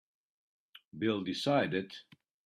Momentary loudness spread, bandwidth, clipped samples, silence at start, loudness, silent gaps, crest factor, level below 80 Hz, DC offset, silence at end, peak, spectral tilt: 19 LU; 13.5 kHz; under 0.1%; 0.95 s; -33 LUFS; none; 20 dB; -76 dBFS; under 0.1%; 0.45 s; -16 dBFS; -5.5 dB/octave